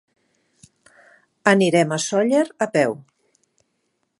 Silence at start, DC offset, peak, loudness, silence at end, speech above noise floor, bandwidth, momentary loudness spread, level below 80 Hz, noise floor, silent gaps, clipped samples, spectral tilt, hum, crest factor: 1.45 s; under 0.1%; 0 dBFS; -19 LUFS; 1.2 s; 54 dB; 11.5 kHz; 7 LU; -72 dBFS; -72 dBFS; none; under 0.1%; -5 dB/octave; none; 22 dB